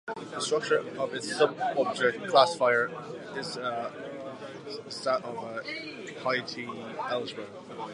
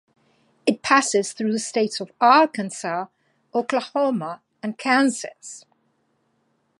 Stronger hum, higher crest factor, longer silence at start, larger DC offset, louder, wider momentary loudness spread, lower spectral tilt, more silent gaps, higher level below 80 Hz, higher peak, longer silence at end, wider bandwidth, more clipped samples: neither; about the same, 24 dB vs 22 dB; second, 0.05 s vs 0.65 s; neither; second, -30 LUFS vs -21 LUFS; about the same, 16 LU vs 17 LU; about the same, -3.5 dB/octave vs -3.5 dB/octave; neither; about the same, -78 dBFS vs -74 dBFS; second, -6 dBFS vs -2 dBFS; second, 0 s vs 1.2 s; about the same, 11.5 kHz vs 11.5 kHz; neither